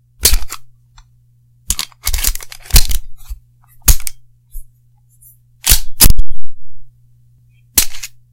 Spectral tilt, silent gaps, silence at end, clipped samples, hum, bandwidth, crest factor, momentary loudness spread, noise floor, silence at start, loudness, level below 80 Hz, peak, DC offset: -1.5 dB/octave; none; 0.25 s; 4%; 60 Hz at -40 dBFS; over 20 kHz; 12 dB; 21 LU; -51 dBFS; 0.2 s; -14 LUFS; -20 dBFS; 0 dBFS; under 0.1%